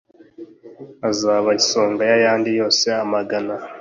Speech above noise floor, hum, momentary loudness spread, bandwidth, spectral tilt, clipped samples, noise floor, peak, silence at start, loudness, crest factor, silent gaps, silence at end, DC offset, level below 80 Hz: 23 dB; none; 8 LU; 7.6 kHz; -2.5 dB/octave; under 0.1%; -41 dBFS; -4 dBFS; 0.4 s; -18 LUFS; 16 dB; none; 0 s; under 0.1%; -64 dBFS